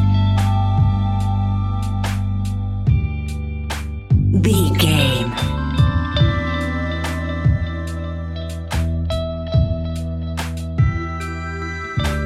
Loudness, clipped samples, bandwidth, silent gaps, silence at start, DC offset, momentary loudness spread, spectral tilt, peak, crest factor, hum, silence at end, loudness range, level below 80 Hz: -20 LUFS; under 0.1%; 14 kHz; none; 0 s; under 0.1%; 10 LU; -6 dB/octave; -2 dBFS; 16 dB; none; 0 s; 5 LU; -26 dBFS